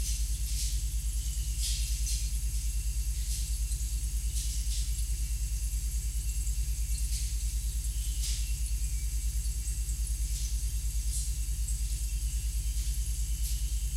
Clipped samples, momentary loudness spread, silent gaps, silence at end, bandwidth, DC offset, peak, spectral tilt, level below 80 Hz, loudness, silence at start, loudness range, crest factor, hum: under 0.1%; 2 LU; none; 0 s; 16 kHz; under 0.1%; -20 dBFS; -2.5 dB/octave; -32 dBFS; -34 LUFS; 0 s; 1 LU; 12 dB; 50 Hz at -35 dBFS